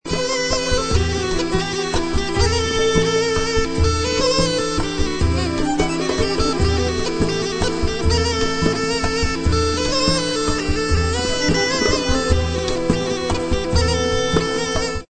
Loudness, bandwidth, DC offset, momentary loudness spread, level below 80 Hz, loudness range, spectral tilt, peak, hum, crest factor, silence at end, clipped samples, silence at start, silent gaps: -19 LUFS; 9.2 kHz; under 0.1%; 4 LU; -26 dBFS; 1 LU; -4.5 dB/octave; -2 dBFS; none; 18 dB; 0.05 s; under 0.1%; 0.05 s; none